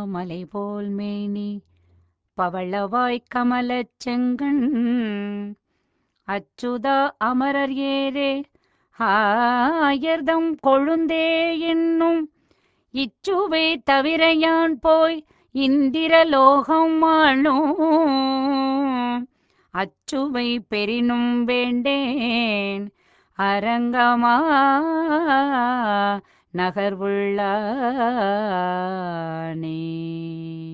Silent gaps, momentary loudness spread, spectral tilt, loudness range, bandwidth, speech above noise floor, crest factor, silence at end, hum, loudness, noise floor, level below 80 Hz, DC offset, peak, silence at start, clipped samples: none; 13 LU; -6 dB/octave; 7 LU; 7.8 kHz; 50 dB; 20 dB; 0 s; none; -21 LUFS; -71 dBFS; -60 dBFS; under 0.1%; -2 dBFS; 0 s; under 0.1%